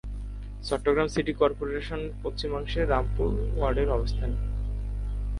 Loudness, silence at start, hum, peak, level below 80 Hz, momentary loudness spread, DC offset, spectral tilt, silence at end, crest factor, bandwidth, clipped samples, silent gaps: -29 LUFS; 0.05 s; 50 Hz at -30 dBFS; -10 dBFS; -32 dBFS; 9 LU; under 0.1%; -6.5 dB/octave; 0 s; 18 dB; 11 kHz; under 0.1%; none